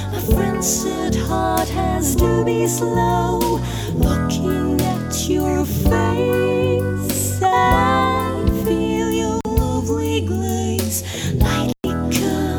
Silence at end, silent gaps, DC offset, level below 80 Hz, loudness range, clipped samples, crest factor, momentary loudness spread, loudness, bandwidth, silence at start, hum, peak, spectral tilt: 0 s; none; under 0.1%; -28 dBFS; 3 LU; under 0.1%; 16 dB; 4 LU; -19 LUFS; over 20 kHz; 0 s; none; -2 dBFS; -5 dB/octave